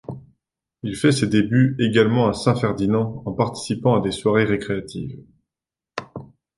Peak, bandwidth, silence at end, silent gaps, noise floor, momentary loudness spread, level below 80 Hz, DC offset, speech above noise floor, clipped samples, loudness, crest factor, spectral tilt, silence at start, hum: -2 dBFS; 11.5 kHz; 0.3 s; none; -89 dBFS; 17 LU; -50 dBFS; under 0.1%; 69 dB; under 0.1%; -20 LUFS; 18 dB; -6.5 dB/octave; 0.1 s; none